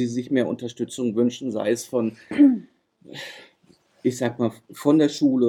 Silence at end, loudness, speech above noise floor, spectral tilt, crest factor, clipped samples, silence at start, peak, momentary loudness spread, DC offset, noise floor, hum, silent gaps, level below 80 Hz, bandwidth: 0 s; -23 LUFS; 37 dB; -6 dB/octave; 16 dB; under 0.1%; 0 s; -6 dBFS; 16 LU; under 0.1%; -59 dBFS; none; none; -72 dBFS; 13.5 kHz